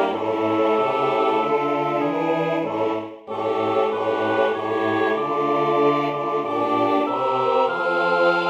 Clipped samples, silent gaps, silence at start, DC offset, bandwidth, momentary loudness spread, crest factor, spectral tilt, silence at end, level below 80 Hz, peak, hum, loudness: under 0.1%; none; 0 s; under 0.1%; 8.2 kHz; 4 LU; 14 dB; -6.5 dB/octave; 0 s; -68 dBFS; -6 dBFS; none; -21 LUFS